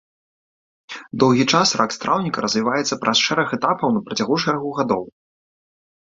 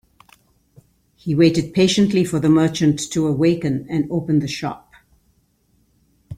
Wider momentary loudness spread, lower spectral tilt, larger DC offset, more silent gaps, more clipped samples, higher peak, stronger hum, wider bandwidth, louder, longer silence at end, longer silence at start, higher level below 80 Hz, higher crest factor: about the same, 8 LU vs 10 LU; second, -4 dB/octave vs -6 dB/octave; neither; neither; neither; about the same, -2 dBFS vs -2 dBFS; neither; second, 7.8 kHz vs 14.5 kHz; about the same, -19 LUFS vs -18 LUFS; first, 0.95 s vs 0 s; second, 0.9 s vs 1.25 s; second, -60 dBFS vs -52 dBFS; about the same, 20 dB vs 18 dB